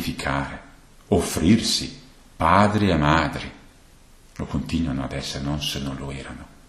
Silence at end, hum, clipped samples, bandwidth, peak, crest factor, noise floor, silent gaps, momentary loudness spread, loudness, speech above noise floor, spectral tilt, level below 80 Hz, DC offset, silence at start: 0.2 s; none; under 0.1%; 13.5 kHz; -2 dBFS; 22 dB; -50 dBFS; none; 17 LU; -22 LUFS; 28 dB; -5 dB/octave; -38 dBFS; under 0.1%; 0 s